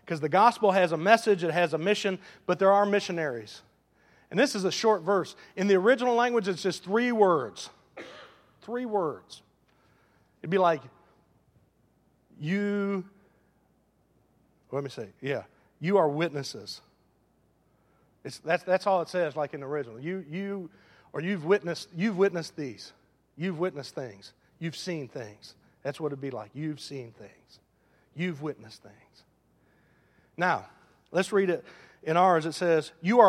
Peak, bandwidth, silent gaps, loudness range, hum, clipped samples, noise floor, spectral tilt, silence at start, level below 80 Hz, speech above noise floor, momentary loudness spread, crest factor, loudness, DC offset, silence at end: -4 dBFS; 13.5 kHz; none; 11 LU; none; under 0.1%; -68 dBFS; -5.5 dB/octave; 0.05 s; -76 dBFS; 40 dB; 19 LU; 24 dB; -28 LUFS; under 0.1%; 0 s